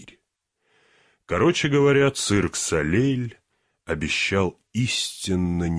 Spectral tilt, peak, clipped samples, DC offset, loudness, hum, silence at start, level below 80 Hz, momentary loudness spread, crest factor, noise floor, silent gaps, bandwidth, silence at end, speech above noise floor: -4.5 dB/octave; -8 dBFS; under 0.1%; under 0.1%; -22 LUFS; none; 0 s; -46 dBFS; 10 LU; 16 dB; -75 dBFS; none; 11 kHz; 0 s; 53 dB